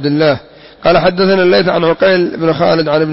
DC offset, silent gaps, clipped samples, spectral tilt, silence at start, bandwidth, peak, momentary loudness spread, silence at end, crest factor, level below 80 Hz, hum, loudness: under 0.1%; none; under 0.1%; -9.5 dB/octave; 0 s; 5.8 kHz; 0 dBFS; 4 LU; 0 s; 10 dB; -40 dBFS; none; -11 LUFS